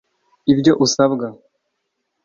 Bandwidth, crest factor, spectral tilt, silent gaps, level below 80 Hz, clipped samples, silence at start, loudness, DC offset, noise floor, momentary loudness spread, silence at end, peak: 7.6 kHz; 18 dB; -5 dB/octave; none; -56 dBFS; under 0.1%; 0.45 s; -16 LUFS; under 0.1%; -74 dBFS; 11 LU; 0.9 s; -2 dBFS